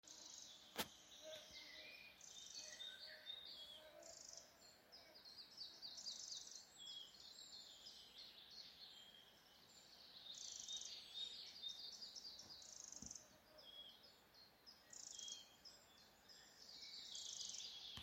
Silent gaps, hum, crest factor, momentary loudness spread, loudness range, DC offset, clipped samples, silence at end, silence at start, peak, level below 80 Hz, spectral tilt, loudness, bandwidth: none; none; 28 dB; 14 LU; 6 LU; under 0.1%; under 0.1%; 0 s; 0.05 s; -30 dBFS; -86 dBFS; 0 dB/octave; -55 LUFS; 16.5 kHz